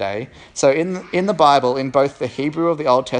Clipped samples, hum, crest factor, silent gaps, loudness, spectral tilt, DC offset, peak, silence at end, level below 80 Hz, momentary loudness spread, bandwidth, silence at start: under 0.1%; none; 18 dB; none; -18 LUFS; -5 dB/octave; under 0.1%; 0 dBFS; 0 s; -56 dBFS; 10 LU; 10.5 kHz; 0 s